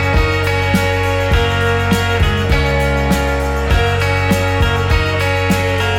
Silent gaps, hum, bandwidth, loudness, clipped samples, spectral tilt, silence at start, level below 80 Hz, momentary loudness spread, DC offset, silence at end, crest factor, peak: none; none; 17 kHz; -15 LUFS; under 0.1%; -5.5 dB/octave; 0 s; -20 dBFS; 1 LU; under 0.1%; 0 s; 12 dB; -2 dBFS